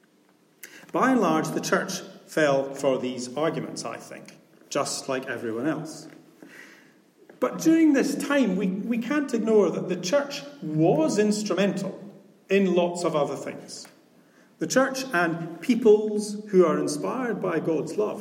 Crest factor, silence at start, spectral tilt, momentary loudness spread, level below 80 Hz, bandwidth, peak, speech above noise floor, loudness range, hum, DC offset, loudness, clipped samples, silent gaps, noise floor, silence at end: 18 dB; 0.65 s; -5 dB/octave; 14 LU; -78 dBFS; 16.5 kHz; -8 dBFS; 37 dB; 7 LU; none; under 0.1%; -25 LUFS; under 0.1%; none; -61 dBFS; 0 s